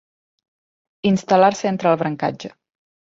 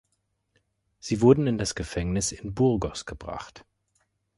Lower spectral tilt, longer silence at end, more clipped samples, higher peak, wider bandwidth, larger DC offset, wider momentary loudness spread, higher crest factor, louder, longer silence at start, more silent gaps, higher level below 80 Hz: about the same, -6 dB/octave vs -5.5 dB/octave; second, 0.6 s vs 0.8 s; neither; first, -2 dBFS vs -6 dBFS; second, 7.8 kHz vs 11.5 kHz; neither; second, 13 LU vs 18 LU; about the same, 18 dB vs 22 dB; first, -19 LUFS vs -25 LUFS; about the same, 1.05 s vs 1.05 s; neither; second, -62 dBFS vs -46 dBFS